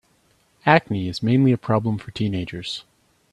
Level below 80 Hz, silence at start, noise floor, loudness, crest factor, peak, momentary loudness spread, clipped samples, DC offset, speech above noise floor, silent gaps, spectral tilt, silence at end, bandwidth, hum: -54 dBFS; 0.65 s; -62 dBFS; -21 LUFS; 22 dB; 0 dBFS; 12 LU; under 0.1%; under 0.1%; 41 dB; none; -7 dB/octave; 0.5 s; 11.5 kHz; none